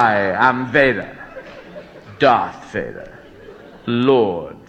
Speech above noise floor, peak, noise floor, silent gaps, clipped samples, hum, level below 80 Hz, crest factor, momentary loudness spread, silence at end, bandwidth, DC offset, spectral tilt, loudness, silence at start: 23 dB; 0 dBFS; -40 dBFS; none; under 0.1%; none; -50 dBFS; 18 dB; 22 LU; 0.1 s; 8.6 kHz; under 0.1%; -7 dB/octave; -17 LUFS; 0 s